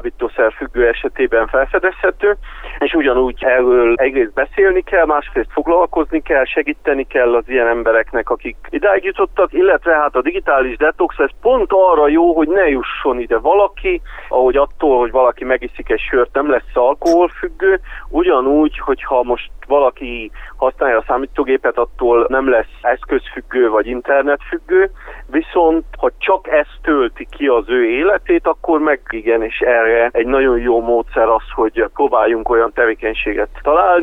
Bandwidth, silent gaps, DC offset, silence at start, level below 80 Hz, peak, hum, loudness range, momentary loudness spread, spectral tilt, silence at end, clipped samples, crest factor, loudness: 6.2 kHz; none; under 0.1%; 0 s; -34 dBFS; 0 dBFS; none; 3 LU; 7 LU; -6 dB/octave; 0 s; under 0.1%; 14 dB; -15 LUFS